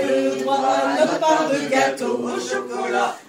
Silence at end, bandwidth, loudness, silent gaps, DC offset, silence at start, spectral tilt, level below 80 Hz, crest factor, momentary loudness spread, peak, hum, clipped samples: 0.05 s; 16 kHz; -20 LUFS; none; under 0.1%; 0 s; -3.5 dB/octave; -72 dBFS; 16 dB; 6 LU; -4 dBFS; none; under 0.1%